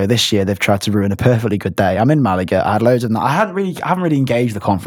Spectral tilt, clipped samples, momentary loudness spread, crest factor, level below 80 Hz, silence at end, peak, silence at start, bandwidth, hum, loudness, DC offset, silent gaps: -6 dB/octave; under 0.1%; 4 LU; 14 dB; -46 dBFS; 0 s; 0 dBFS; 0 s; 18 kHz; none; -16 LUFS; under 0.1%; none